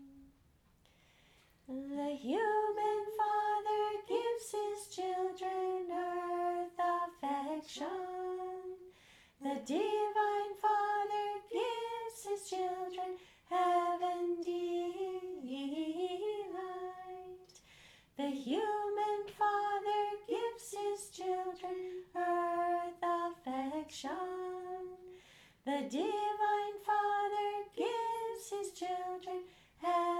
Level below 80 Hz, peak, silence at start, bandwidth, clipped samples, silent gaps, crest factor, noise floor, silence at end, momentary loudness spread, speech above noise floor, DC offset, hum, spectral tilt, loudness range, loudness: -76 dBFS; -22 dBFS; 0 s; 16.5 kHz; under 0.1%; none; 16 dB; -69 dBFS; 0 s; 10 LU; 33 dB; under 0.1%; none; -3 dB/octave; 4 LU; -37 LUFS